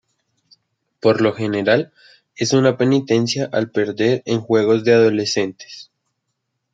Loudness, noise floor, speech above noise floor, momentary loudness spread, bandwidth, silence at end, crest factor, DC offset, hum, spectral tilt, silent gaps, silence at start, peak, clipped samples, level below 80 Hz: -17 LUFS; -75 dBFS; 58 dB; 10 LU; 9 kHz; 0.9 s; 18 dB; under 0.1%; none; -5.5 dB/octave; none; 1.05 s; -2 dBFS; under 0.1%; -64 dBFS